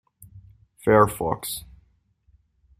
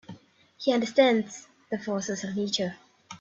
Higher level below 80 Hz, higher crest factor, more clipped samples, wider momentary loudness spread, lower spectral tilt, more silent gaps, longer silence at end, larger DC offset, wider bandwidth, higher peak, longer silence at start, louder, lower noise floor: first, -50 dBFS vs -72 dBFS; about the same, 24 dB vs 22 dB; neither; about the same, 14 LU vs 16 LU; first, -5.5 dB/octave vs -4 dB/octave; neither; first, 1.2 s vs 0.05 s; neither; first, 16 kHz vs 8 kHz; first, -2 dBFS vs -6 dBFS; first, 0.35 s vs 0.1 s; first, -22 LUFS vs -27 LUFS; first, -63 dBFS vs -50 dBFS